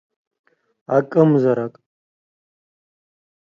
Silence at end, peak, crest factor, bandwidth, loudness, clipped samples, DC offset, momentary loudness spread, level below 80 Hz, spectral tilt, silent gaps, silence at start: 1.75 s; -2 dBFS; 20 dB; 7 kHz; -17 LUFS; under 0.1%; under 0.1%; 9 LU; -70 dBFS; -10 dB/octave; none; 0.9 s